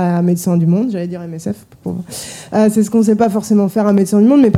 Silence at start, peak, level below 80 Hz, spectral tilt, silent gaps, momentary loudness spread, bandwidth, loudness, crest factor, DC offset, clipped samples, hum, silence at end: 0 s; 0 dBFS; -54 dBFS; -7.5 dB/octave; none; 14 LU; 15 kHz; -14 LUFS; 14 dB; under 0.1%; under 0.1%; none; 0 s